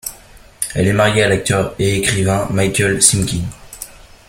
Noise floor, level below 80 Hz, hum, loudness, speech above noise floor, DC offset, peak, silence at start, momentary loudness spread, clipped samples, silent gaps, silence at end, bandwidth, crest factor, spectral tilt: -42 dBFS; -38 dBFS; none; -15 LUFS; 27 dB; under 0.1%; 0 dBFS; 0.05 s; 19 LU; under 0.1%; none; 0.4 s; 16.5 kHz; 16 dB; -4 dB/octave